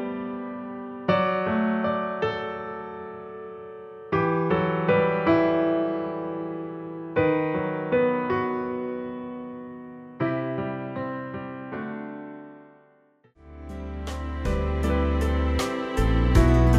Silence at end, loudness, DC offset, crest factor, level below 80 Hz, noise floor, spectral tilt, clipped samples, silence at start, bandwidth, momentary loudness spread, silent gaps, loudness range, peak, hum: 0 s; -26 LUFS; under 0.1%; 20 dB; -32 dBFS; -60 dBFS; -7.5 dB/octave; under 0.1%; 0 s; 13.5 kHz; 17 LU; none; 9 LU; -6 dBFS; none